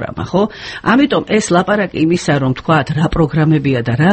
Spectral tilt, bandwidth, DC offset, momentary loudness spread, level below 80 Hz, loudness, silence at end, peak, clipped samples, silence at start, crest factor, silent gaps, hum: -6 dB/octave; 8.8 kHz; under 0.1%; 4 LU; -36 dBFS; -14 LUFS; 0 s; 0 dBFS; under 0.1%; 0 s; 14 dB; none; none